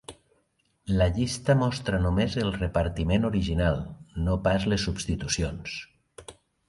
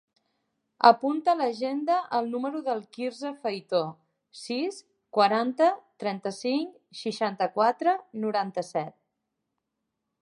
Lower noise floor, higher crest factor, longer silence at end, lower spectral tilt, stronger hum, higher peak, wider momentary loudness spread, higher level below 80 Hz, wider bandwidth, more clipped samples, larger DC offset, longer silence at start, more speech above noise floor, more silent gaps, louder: second, -70 dBFS vs -83 dBFS; second, 18 dB vs 24 dB; second, 0.35 s vs 1.3 s; about the same, -5.5 dB/octave vs -5 dB/octave; neither; second, -8 dBFS vs -4 dBFS; first, 16 LU vs 11 LU; first, -38 dBFS vs -84 dBFS; about the same, 11.5 kHz vs 11 kHz; neither; neither; second, 0.1 s vs 0.8 s; second, 45 dB vs 56 dB; neither; about the same, -27 LUFS vs -27 LUFS